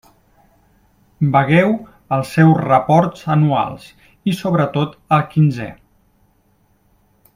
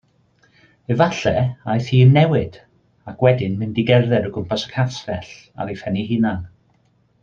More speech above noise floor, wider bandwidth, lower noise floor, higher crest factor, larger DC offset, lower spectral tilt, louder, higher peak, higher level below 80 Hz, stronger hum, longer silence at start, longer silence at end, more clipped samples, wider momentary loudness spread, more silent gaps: about the same, 43 dB vs 42 dB; first, 14 kHz vs 7.2 kHz; about the same, -58 dBFS vs -60 dBFS; about the same, 18 dB vs 18 dB; neither; about the same, -8 dB/octave vs -7.5 dB/octave; first, -16 LUFS vs -19 LUFS; about the same, 0 dBFS vs -2 dBFS; about the same, -52 dBFS vs -50 dBFS; neither; first, 1.2 s vs 0.9 s; first, 1.65 s vs 0.75 s; neither; second, 12 LU vs 17 LU; neither